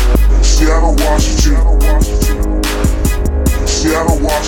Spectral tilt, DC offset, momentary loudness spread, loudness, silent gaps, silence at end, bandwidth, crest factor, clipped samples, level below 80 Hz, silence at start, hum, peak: -5 dB/octave; under 0.1%; 4 LU; -13 LUFS; none; 0 s; 17 kHz; 10 dB; under 0.1%; -12 dBFS; 0 s; none; 0 dBFS